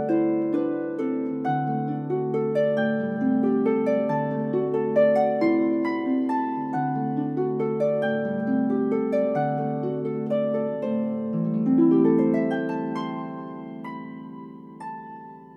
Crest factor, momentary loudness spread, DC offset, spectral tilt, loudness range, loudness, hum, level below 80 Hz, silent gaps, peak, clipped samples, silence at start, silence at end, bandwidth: 16 dB; 16 LU; under 0.1%; -9.5 dB/octave; 3 LU; -24 LUFS; none; -74 dBFS; none; -8 dBFS; under 0.1%; 0 s; 0 s; 5.6 kHz